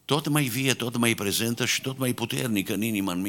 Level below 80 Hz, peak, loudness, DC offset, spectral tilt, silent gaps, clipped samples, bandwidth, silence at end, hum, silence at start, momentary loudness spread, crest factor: -64 dBFS; -2 dBFS; -25 LUFS; under 0.1%; -4 dB/octave; none; under 0.1%; 18.5 kHz; 0 s; none; 0.1 s; 4 LU; 24 dB